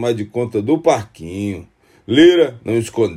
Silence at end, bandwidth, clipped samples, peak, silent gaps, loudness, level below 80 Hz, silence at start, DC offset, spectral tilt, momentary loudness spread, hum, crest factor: 0 s; 12.5 kHz; under 0.1%; 0 dBFS; none; -16 LUFS; -52 dBFS; 0 s; under 0.1%; -6 dB/octave; 15 LU; none; 16 dB